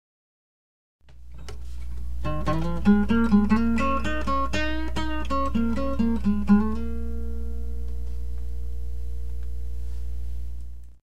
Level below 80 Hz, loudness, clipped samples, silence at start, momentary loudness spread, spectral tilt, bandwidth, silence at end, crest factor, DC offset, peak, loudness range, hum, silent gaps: -32 dBFS; -27 LUFS; under 0.1%; 1 s; 17 LU; -7.5 dB/octave; 10.5 kHz; 0 s; 18 dB; 4%; -8 dBFS; 11 LU; 60 Hz at -30 dBFS; none